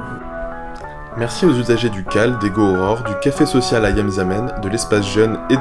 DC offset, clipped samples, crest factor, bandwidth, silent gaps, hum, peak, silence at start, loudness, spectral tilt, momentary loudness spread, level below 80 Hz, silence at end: under 0.1%; under 0.1%; 16 dB; 12 kHz; none; none; 0 dBFS; 0 s; -17 LUFS; -5.5 dB/octave; 13 LU; -34 dBFS; 0 s